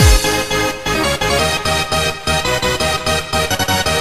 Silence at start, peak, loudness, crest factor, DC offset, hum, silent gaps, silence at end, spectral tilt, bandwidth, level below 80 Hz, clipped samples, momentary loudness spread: 0 s; 0 dBFS; -15 LUFS; 16 dB; under 0.1%; none; none; 0 s; -3 dB/octave; 15.5 kHz; -22 dBFS; under 0.1%; 3 LU